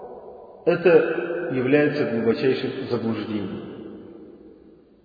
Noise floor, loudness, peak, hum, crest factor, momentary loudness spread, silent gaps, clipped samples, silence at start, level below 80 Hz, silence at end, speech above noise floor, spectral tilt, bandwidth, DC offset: -51 dBFS; -22 LUFS; -4 dBFS; none; 20 dB; 23 LU; none; under 0.1%; 0 s; -62 dBFS; 0.55 s; 30 dB; -9 dB/octave; 5 kHz; under 0.1%